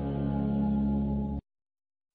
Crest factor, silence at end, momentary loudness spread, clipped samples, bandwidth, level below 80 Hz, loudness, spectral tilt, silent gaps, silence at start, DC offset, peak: 12 dB; 0.75 s; 7 LU; under 0.1%; 3.9 kHz; -40 dBFS; -30 LUFS; -10.5 dB/octave; none; 0 s; under 0.1%; -20 dBFS